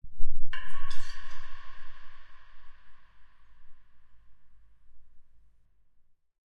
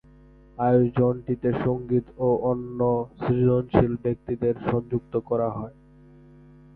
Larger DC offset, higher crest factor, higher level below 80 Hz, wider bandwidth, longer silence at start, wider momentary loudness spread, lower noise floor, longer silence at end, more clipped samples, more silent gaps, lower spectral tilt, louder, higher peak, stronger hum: neither; about the same, 16 dB vs 20 dB; first, -38 dBFS vs -48 dBFS; first, 5.2 kHz vs 4.3 kHz; second, 0.05 s vs 0.6 s; first, 27 LU vs 8 LU; first, -59 dBFS vs -51 dBFS; first, 1.4 s vs 1.05 s; neither; neither; second, -3.5 dB/octave vs -12 dB/octave; second, -45 LUFS vs -24 LUFS; second, -8 dBFS vs -4 dBFS; neither